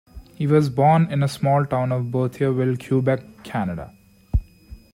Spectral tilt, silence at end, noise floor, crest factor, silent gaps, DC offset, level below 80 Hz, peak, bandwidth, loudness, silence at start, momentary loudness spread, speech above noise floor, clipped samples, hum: -8 dB/octave; 0.15 s; -44 dBFS; 16 dB; none; under 0.1%; -36 dBFS; -6 dBFS; 15 kHz; -21 LUFS; 0.15 s; 11 LU; 24 dB; under 0.1%; none